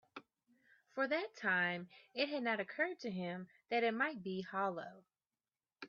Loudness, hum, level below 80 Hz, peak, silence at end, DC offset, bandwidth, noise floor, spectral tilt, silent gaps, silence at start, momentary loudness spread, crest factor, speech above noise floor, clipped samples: -39 LUFS; none; -88 dBFS; -22 dBFS; 0 s; under 0.1%; 7 kHz; under -90 dBFS; -2.5 dB/octave; none; 0.15 s; 14 LU; 18 dB; over 51 dB; under 0.1%